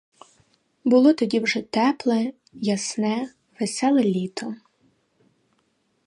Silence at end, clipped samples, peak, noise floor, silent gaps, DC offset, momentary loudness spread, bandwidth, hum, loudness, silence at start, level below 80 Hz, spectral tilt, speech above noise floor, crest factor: 1.5 s; under 0.1%; -6 dBFS; -69 dBFS; none; under 0.1%; 13 LU; 11 kHz; none; -22 LUFS; 0.85 s; -72 dBFS; -5 dB/octave; 47 dB; 18 dB